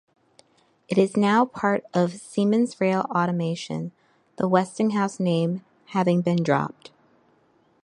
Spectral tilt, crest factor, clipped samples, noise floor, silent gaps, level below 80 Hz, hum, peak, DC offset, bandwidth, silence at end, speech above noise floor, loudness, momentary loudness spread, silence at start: -7 dB/octave; 20 dB; under 0.1%; -62 dBFS; none; -70 dBFS; none; -4 dBFS; under 0.1%; 11 kHz; 1.1 s; 40 dB; -24 LUFS; 9 LU; 0.9 s